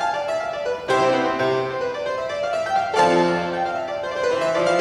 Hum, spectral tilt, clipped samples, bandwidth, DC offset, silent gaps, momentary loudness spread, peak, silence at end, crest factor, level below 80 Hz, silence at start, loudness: none; -4.5 dB/octave; under 0.1%; 12 kHz; under 0.1%; none; 8 LU; -6 dBFS; 0 s; 16 dB; -58 dBFS; 0 s; -22 LUFS